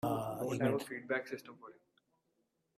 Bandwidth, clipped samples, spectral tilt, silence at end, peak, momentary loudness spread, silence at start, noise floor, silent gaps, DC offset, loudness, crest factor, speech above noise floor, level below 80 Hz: 16 kHz; under 0.1%; -6 dB/octave; 1.05 s; -20 dBFS; 21 LU; 0.05 s; -81 dBFS; none; under 0.1%; -38 LUFS; 20 dB; 43 dB; -74 dBFS